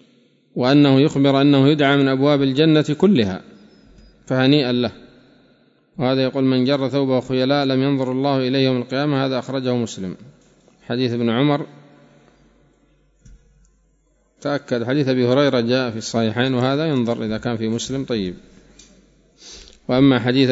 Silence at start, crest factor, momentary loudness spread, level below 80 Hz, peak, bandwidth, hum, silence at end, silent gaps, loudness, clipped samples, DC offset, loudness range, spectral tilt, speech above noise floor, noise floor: 0.55 s; 18 dB; 11 LU; -54 dBFS; -2 dBFS; 7.8 kHz; none; 0 s; none; -18 LUFS; under 0.1%; under 0.1%; 9 LU; -6.5 dB/octave; 43 dB; -61 dBFS